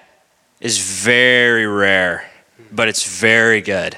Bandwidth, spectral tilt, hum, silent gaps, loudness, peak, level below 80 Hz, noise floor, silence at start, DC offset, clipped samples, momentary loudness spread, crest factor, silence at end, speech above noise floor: 15.5 kHz; -2.5 dB/octave; none; none; -13 LUFS; 0 dBFS; -60 dBFS; -57 dBFS; 0.65 s; under 0.1%; under 0.1%; 9 LU; 16 dB; 0 s; 42 dB